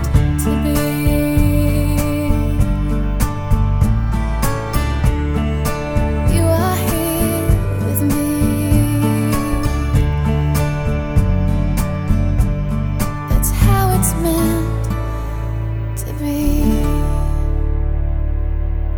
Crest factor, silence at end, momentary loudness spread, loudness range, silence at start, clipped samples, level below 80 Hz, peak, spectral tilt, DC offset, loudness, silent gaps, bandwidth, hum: 14 dB; 0 s; 6 LU; 3 LU; 0 s; under 0.1%; -20 dBFS; 0 dBFS; -6.5 dB/octave; under 0.1%; -18 LUFS; none; over 20 kHz; none